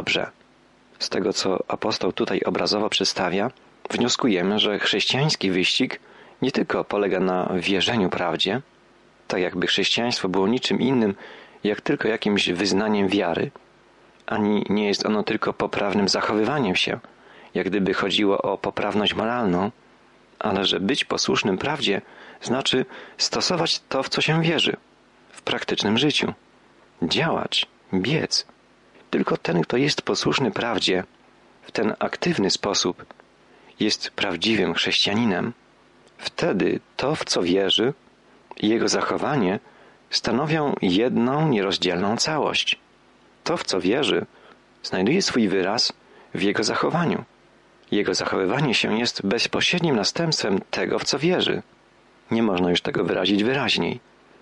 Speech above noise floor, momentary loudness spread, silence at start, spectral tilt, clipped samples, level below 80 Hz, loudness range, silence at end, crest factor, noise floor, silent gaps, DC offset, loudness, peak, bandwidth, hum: 33 dB; 8 LU; 0 s; -4 dB/octave; under 0.1%; -60 dBFS; 2 LU; 0.45 s; 14 dB; -56 dBFS; none; under 0.1%; -22 LUFS; -10 dBFS; 11.5 kHz; none